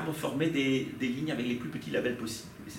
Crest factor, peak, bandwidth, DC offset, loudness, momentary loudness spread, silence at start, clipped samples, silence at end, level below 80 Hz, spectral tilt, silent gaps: 16 dB; -16 dBFS; 16.5 kHz; under 0.1%; -32 LUFS; 8 LU; 0 s; under 0.1%; 0 s; -64 dBFS; -5 dB/octave; none